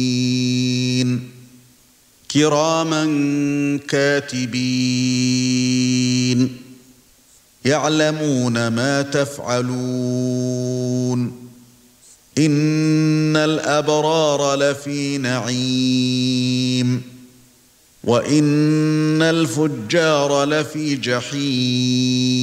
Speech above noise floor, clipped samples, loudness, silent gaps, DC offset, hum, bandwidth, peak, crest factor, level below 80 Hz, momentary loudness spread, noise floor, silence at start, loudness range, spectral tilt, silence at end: 35 dB; under 0.1%; -18 LUFS; none; under 0.1%; none; 15.5 kHz; -2 dBFS; 16 dB; -62 dBFS; 6 LU; -53 dBFS; 0 s; 3 LU; -5 dB/octave; 0 s